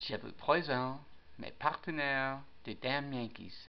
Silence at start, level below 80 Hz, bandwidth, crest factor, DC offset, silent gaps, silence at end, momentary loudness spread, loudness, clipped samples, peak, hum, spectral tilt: 0 s; -66 dBFS; 6.2 kHz; 24 dB; 0.3%; none; 0.1 s; 17 LU; -36 LUFS; under 0.1%; -14 dBFS; none; -3 dB/octave